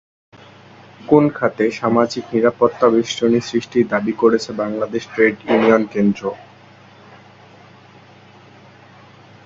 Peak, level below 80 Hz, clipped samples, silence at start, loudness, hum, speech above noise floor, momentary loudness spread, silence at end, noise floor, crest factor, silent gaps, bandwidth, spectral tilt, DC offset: 0 dBFS; -58 dBFS; under 0.1%; 1 s; -17 LUFS; none; 28 dB; 9 LU; 3.05 s; -45 dBFS; 18 dB; none; 7.8 kHz; -6 dB/octave; under 0.1%